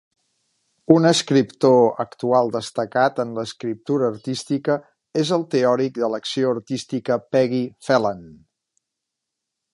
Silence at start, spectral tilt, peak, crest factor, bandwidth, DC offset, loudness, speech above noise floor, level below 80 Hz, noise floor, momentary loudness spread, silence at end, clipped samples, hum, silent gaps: 0.9 s; -5.5 dB/octave; 0 dBFS; 20 dB; 11.5 kHz; under 0.1%; -21 LUFS; 62 dB; -66 dBFS; -82 dBFS; 11 LU; 1.4 s; under 0.1%; none; none